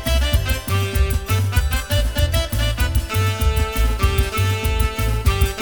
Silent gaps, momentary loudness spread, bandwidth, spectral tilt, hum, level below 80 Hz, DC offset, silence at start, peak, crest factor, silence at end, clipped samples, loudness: none; 2 LU; over 20 kHz; -4.5 dB/octave; none; -20 dBFS; 0.6%; 0 s; -4 dBFS; 14 dB; 0 s; under 0.1%; -20 LUFS